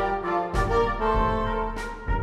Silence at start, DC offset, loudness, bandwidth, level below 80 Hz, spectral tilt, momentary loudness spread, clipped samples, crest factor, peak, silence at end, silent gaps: 0 s; under 0.1%; -26 LUFS; 12 kHz; -32 dBFS; -6.5 dB/octave; 7 LU; under 0.1%; 14 dB; -12 dBFS; 0 s; none